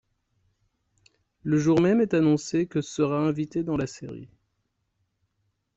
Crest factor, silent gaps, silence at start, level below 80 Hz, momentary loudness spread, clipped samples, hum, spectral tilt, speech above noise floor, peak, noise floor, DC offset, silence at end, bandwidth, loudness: 18 dB; none; 1.45 s; -60 dBFS; 16 LU; under 0.1%; none; -7 dB/octave; 52 dB; -10 dBFS; -76 dBFS; under 0.1%; 1.5 s; 8 kHz; -24 LUFS